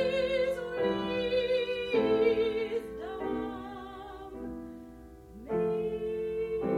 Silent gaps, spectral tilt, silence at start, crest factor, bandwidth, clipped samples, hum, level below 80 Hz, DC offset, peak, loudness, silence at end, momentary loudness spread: none; -6.5 dB/octave; 0 s; 16 dB; 12.5 kHz; under 0.1%; none; -54 dBFS; under 0.1%; -16 dBFS; -31 LUFS; 0 s; 17 LU